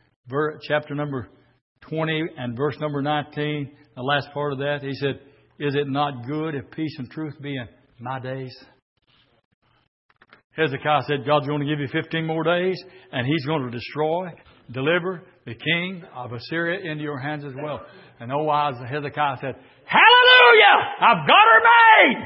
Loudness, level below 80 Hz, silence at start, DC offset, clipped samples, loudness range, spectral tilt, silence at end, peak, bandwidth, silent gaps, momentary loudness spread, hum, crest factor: -19 LUFS; -66 dBFS; 0.25 s; under 0.1%; under 0.1%; 15 LU; -9.5 dB/octave; 0 s; 0 dBFS; 5.8 kHz; 1.61-1.75 s, 8.82-8.96 s, 9.45-9.62 s, 9.88-10.09 s, 10.44-10.50 s; 21 LU; none; 20 dB